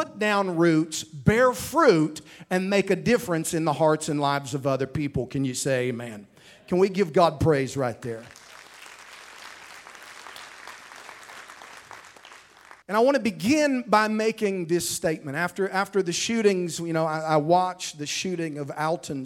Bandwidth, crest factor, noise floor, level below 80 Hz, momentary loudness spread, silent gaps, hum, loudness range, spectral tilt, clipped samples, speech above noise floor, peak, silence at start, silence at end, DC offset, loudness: 16.5 kHz; 20 dB; -51 dBFS; -54 dBFS; 22 LU; none; none; 19 LU; -5 dB/octave; under 0.1%; 27 dB; -4 dBFS; 0 s; 0 s; under 0.1%; -24 LUFS